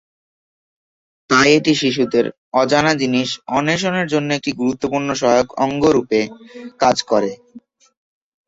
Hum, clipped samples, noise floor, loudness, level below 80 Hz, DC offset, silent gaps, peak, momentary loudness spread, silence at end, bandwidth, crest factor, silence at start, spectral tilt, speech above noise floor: none; under 0.1%; under -90 dBFS; -17 LUFS; -54 dBFS; under 0.1%; 2.38-2.52 s; -2 dBFS; 7 LU; 0.9 s; 8 kHz; 18 dB; 1.3 s; -4.5 dB/octave; over 73 dB